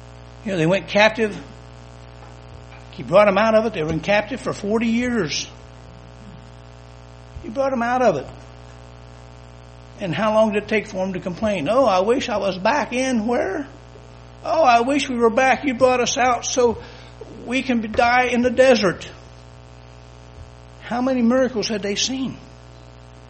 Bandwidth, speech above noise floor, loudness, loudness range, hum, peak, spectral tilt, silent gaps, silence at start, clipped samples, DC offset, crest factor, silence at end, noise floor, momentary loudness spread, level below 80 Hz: 8.8 kHz; 23 dB; -19 LUFS; 7 LU; 60 Hz at -40 dBFS; 0 dBFS; -4.5 dB/octave; none; 0 s; under 0.1%; under 0.1%; 22 dB; 0 s; -42 dBFS; 23 LU; -46 dBFS